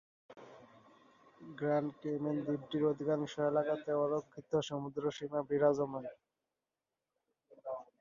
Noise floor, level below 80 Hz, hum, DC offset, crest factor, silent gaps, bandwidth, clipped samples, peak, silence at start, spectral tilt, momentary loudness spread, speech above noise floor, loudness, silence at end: under -90 dBFS; -78 dBFS; none; under 0.1%; 20 dB; none; 7.2 kHz; under 0.1%; -18 dBFS; 0.3 s; -6 dB/octave; 19 LU; over 55 dB; -36 LUFS; 0.2 s